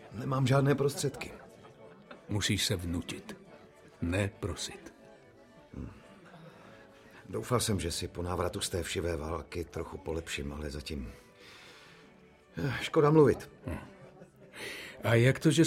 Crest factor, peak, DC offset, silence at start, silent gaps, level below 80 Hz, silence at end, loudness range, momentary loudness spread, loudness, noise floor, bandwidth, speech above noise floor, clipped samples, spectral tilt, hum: 24 dB; -10 dBFS; under 0.1%; 0 s; none; -52 dBFS; 0 s; 9 LU; 26 LU; -32 LUFS; -59 dBFS; 16 kHz; 28 dB; under 0.1%; -5 dB/octave; none